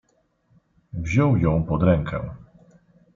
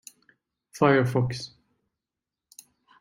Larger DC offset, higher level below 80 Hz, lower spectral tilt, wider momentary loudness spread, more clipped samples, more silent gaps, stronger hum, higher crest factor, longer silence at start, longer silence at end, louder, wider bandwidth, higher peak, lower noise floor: neither; first, -42 dBFS vs -62 dBFS; first, -8.5 dB/octave vs -6.5 dB/octave; about the same, 15 LU vs 17 LU; neither; neither; neither; second, 18 dB vs 24 dB; first, 0.95 s vs 0.75 s; second, 0.75 s vs 1.55 s; about the same, -22 LUFS vs -24 LUFS; second, 7.4 kHz vs 16 kHz; about the same, -6 dBFS vs -6 dBFS; second, -65 dBFS vs -88 dBFS